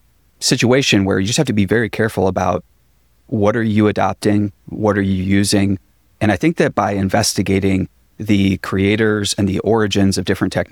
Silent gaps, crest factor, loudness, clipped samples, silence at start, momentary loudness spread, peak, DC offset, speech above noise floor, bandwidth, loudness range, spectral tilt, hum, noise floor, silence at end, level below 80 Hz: none; 14 dB; -16 LUFS; under 0.1%; 0.4 s; 6 LU; -2 dBFS; under 0.1%; 41 dB; 17 kHz; 1 LU; -5 dB/octave; none; -57 dBFS; 0.05 s; -46 dBFS